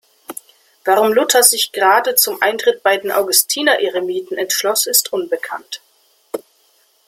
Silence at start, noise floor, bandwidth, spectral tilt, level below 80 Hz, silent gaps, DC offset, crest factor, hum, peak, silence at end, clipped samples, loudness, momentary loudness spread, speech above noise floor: 0.3 s; -57 dBFS; 16.5 kHz; 0 dB/octave; -68 dBFS; none; under 0.1%; 18 dB; none; 0 dBFS; 0.7 s; under 0.1%; -14 LUFS; 18 LU; 41 dB